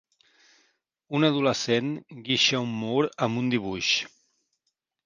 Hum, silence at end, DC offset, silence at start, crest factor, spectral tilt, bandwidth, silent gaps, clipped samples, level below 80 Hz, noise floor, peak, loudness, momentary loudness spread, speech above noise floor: none; 1 s; under 0.1%; 1.1 s; 20 dB; -4 dB/octave; 9.8 kHz; none; under 0.1%; -64 dBFS; -80 dBFS; -6 dBFS; -25 LUFS; 9 LU; 54 dB